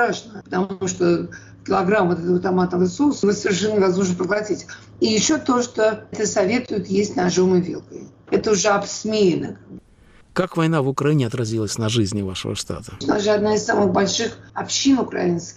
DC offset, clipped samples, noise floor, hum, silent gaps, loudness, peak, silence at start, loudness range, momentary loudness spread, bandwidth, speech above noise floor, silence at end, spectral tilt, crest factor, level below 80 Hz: under 0.1%; under 0.1%; -50 dBFS; none; none; -20 LUFS; -8 dBFS; 0 s; 2 LU; 10 LU; 12 kHz; 30 dB; 0.05 s; -5 dB/octave; 12 dB; -52 dBFS